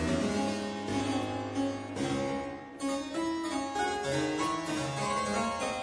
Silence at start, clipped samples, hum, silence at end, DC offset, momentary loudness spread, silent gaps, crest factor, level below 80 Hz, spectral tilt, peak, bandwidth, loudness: 0 s; under 0.1%; none; 0 s; under 0.1%; 4 LU; none; 14 dB; -56 dBFS; -4.5 dB/octave; -18 dBFS; 11 kHz; -33 LUFS